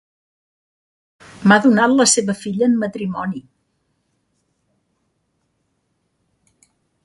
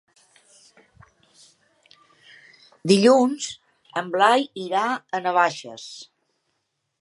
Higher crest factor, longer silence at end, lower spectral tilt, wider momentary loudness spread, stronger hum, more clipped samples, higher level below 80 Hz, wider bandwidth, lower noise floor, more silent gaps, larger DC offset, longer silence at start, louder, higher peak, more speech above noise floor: about the same, 20 dB vs 22 dB; first, 3.65 s vs 0.95 s; about the same, -4 dB/octave vs -4.5 dB/octave; second, 13 LU vs 21 LU; neither; neither; first, -62 dBFS vs -74 dBFS; about the same, 11.5 kHz vs 11.5 kHz; second, -69 dBFS vs -76 dBFS; neither; neither; second, 1.4 s vs 2.85 s; first, -16 LUFS vs -21 LUFS; about the same, 0 dBFS vs -2 dBFS; about the same, 53 dB vs 55 dB